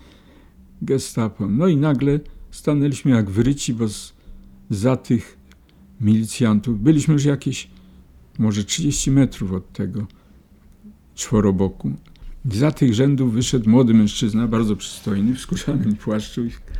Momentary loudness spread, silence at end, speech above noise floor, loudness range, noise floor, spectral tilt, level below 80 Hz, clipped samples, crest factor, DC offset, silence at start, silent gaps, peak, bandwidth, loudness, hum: 12 LU; 0 s; 31 dB; 5 LU; -49 dBFS; -6 dB/octave; -40 dBFS; under 0.1%; 18 dB; under 0.1%; 0.8 s; none; -2 dBFS; 15.5 kHz; -20 LUFS; none